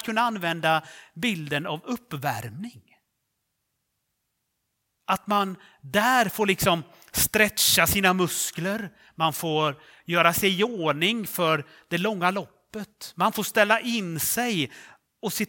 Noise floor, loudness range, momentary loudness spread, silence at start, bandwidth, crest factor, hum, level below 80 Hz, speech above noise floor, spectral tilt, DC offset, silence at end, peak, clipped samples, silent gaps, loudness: -78 dBFS; 11 LU; 15 LU; 0 s; 18 kHz; 24 dB; none; -56 dBFS; 53 dB; -3 dB/octave; under 0.1%; 0 s; -4 dBFS; under 0.1%; none; -24 LUFS